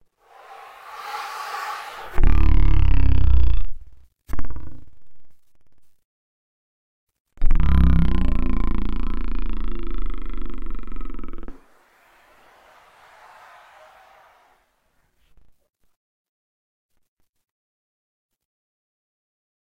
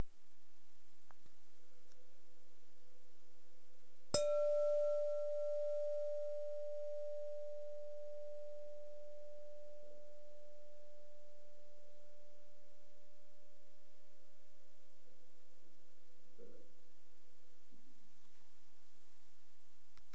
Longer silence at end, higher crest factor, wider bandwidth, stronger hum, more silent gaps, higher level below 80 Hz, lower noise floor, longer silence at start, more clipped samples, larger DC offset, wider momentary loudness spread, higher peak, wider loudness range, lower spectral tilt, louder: first, 1.25 s vs 0.15 s; second, 16 dB vs 26 dB; second, 6.4 kHz vs 8 kHz; neither; first, 6.05-7.07 s, 7.20-7.25 s, 15.96-16.89 s, 17.08-17.17 s, 17.29-17.33 s, 17.51-18.29 s vs none; first, -24 dBFS vs -80 dBFS; second, -66 dBFS vs -76 dBFS; about the same, 0 s vs 0 s; neither; second, under 0.1% vs 1%; about the same, 27 LU vs 26 LU; first, -2 dBFS vs -20 dBFS; first, 24 LU vs 21 LU; first, -7.5 dB/octave vs -4 dB/octave; first, -25 LUFS vs -42 LUFS